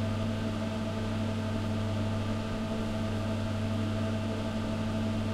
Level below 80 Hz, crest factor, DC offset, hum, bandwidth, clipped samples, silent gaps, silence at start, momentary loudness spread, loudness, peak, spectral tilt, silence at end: -46 dBFS; 12 dB; under 0.1%; none; 12 kHz; under 0.1%; none; 0 s; 2 LU; -33 LUFS; -20 dBFS; -7 dB/octave; 0 s